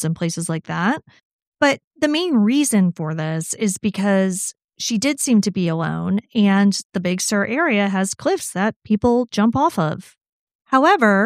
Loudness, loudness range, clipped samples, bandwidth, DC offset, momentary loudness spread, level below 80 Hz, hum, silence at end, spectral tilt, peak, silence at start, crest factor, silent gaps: -19 LUFS; 1 LU; under 0.1%; 15.5 kHz; under 0.1%; 8 LU; -56 dBFS; none; 0 s; -5 dB/octave; -2 dBFS; 0 s; 16 dB; 1.25-1.39 s, 1.47-1.52 s, 1.84-1.91 s, 4.64-4.68 s, 6.85-6.90 s, 8.76-8.80 s, 10.29-10.47 s, 10.55-10.59 s